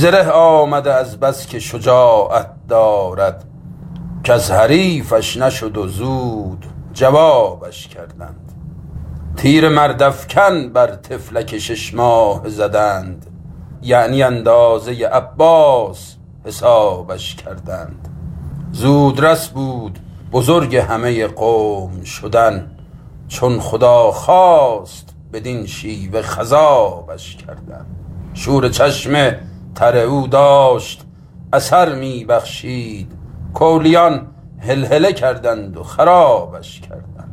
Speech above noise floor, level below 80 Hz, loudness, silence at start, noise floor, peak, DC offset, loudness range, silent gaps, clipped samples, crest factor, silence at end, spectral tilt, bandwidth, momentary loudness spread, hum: 23 dB; -40 dBFS; -13 LUFS; 0 s; -36 dBFS; 0 dBFS; under 0.1%; 4 LU; none; under 0.1%; 14 dB; 0 s; -5.5 dB/octave; 16 kHz; 22 LU; none